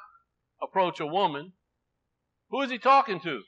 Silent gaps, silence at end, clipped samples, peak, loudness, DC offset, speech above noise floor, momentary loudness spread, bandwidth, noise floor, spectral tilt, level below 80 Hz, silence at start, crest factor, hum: none; 0.05 s; under 0.1%; -8 dBFS; -26 LUFS; under 0.1%; 54 dB; 14 LU; 8 kHz; -81 dBFS; -5.5 dB/octave; -84 dBFS; 0 s; 20 dB; 60 Hz at -70 dBFS